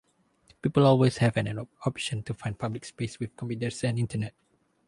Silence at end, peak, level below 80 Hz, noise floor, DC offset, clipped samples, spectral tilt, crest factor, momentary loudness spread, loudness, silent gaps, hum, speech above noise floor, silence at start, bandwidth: 0.55 s; -8 dBFS; -58 dBFS; -63 dBFS; under 0.1%; under 0.1%; -6.5 dB/octave; 20 dB; 13 LU; -28 LUFS; none; none; 36 dB; 0.65 s; 11.5 kHz